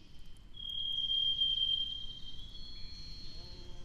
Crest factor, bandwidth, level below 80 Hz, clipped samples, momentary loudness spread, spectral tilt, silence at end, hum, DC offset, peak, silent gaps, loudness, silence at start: 14 dB; 12 kHz; -50 dBFS; under 0.1%; 20 LU; -2.5 dB/octave; 0 s; none; under 0.1%; -24 dBFS; none; -32 LUFS; 0 s